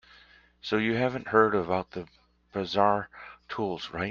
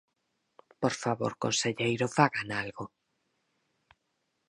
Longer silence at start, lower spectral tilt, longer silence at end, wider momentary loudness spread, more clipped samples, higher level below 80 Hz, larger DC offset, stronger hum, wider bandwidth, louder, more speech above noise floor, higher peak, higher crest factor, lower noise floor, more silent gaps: second, 0.65 s vs 0.8 s; first, -6.5 dB/octave vs -4 dB/octave; second, 0 s vs 1.6 s; first, 18 LU vs 12 LU; neither; first, -62 dBFS vs -68 dBFS; neither; neither; second, 7.2 kHz vs 11.5 kHz; about the same, -28 LUFS vs -30 LUFS; second, 30 dB vs 49 dB; about the same, -6 dBFS vs -6 dBFS; about the same, 22 dB vs 26 dB; second, -57 dBFS vs -79 dBFS; neither